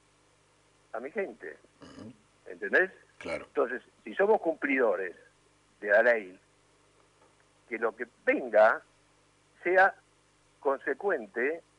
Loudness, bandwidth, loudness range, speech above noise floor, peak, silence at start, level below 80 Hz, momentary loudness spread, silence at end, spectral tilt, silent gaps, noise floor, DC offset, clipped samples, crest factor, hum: -29 LUFS; 11 kHz; 5 LU; 37 dB; -10 dBFS; 0.95 s; -74 dBFS; 20 LU; 0.2 s; -5.5 dB/octave; none; -66 dBFS; under 0.1%; under 0.1%; 20 dB; 50 Hz at -70 dBFS